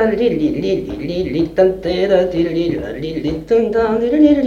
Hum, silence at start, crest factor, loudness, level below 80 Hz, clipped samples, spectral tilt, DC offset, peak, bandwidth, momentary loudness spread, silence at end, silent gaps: none; 0 s; 16 dB; -16 LUFS; -38 dBFS; under 0.1%; -7.5 dB/octave; under 0.1%; 0 dBFS; 7.2 kHz; 8 LU; 0 s; none